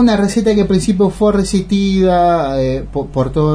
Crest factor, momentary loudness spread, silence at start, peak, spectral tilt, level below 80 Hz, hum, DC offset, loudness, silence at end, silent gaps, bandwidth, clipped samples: 10 dB; 6 LU; 0 s; -2 dBFS; -6.5 dB/octave; -30 dBFS; none; under 0.1%; -14 LUFS; 0 s; none; 11 kHz; under 0.1%